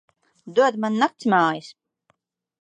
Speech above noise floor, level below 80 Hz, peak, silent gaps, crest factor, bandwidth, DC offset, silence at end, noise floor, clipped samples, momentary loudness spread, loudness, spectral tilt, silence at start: 48 dB; -78 dBFS; -6 dBFS; none; 18 dB; 9.4 kHz; under 0.1%; 0.9 s; -69 dBFS; under 0.1%; 5 LU; -21 LUFS; -5.5 dB/octave; 0.45 s